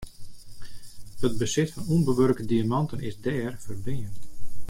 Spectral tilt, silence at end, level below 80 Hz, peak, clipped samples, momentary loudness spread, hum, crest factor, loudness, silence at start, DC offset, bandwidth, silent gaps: -6 dB/octave; 0 s; -44 dBFS; -10 dBFS; under 0.1%; 24 LU; none; 14 dB; -27 LUFS; 0 s; under 0.1%; 16.5 kHz; none